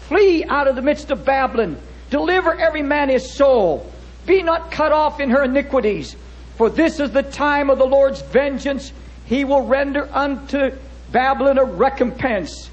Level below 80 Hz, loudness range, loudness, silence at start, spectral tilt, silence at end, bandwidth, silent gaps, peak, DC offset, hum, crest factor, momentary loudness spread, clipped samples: -38 dBFS; 2 LU; -18 LUFS; 0 s; -5.5 dB/octave; 0 s; 8.4 kHz; none; -2 dBFS; under 0.1%; none; 14 dB; 9 LU; under 0.1%